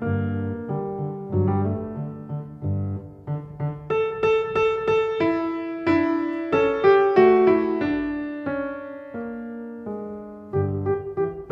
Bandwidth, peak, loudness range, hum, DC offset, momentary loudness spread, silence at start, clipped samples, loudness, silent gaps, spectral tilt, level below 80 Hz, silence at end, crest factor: 6.4 kHz; -4 dBFS; 9 LU; none; under 0.1%; 16 LU; 0 s; under 0.1%; -23 LUFS; none; -9 dB/octave; -54 dBFS; 0 s; 18 dB